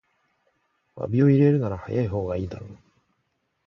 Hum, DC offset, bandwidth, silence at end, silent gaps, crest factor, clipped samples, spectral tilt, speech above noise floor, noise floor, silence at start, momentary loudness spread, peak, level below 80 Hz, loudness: none; under 0.1%; 6.2 kHz; 0.9 s; none; 18 dB; under 0.1%; -10.5 dB/octave; 52 dB; -74 dBFS; 0.95 s; 18 LU; -8 dBFS; -48 dBFS; -23 LUFS